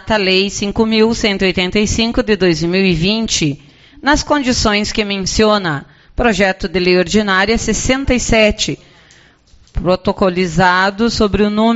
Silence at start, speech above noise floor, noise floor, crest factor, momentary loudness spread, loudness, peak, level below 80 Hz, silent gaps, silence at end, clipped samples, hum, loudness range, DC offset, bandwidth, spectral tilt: 0.05 s; 33 dB; -47 dBFS; 14 dB; 6 LU; -14 LUFS; 0 dBFS; -30 dBFS; none; 0 s; under 0.1%; none; 2 LU; under 0.1%; 8.2 kHz; -4 dB/octave